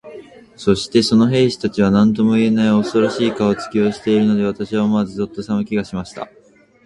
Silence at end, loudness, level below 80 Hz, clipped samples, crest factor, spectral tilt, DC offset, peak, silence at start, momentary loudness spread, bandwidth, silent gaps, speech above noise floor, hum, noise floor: 0.6 s; -17 LUFS; -48 dBFS; under 0.1%; 16 dB; -6.5 dB/octave; under 0.1%; 0 dBFS; 0.05 s; 9 LU; 11.5 kHz; none; 22 dB; none; -38 dBFS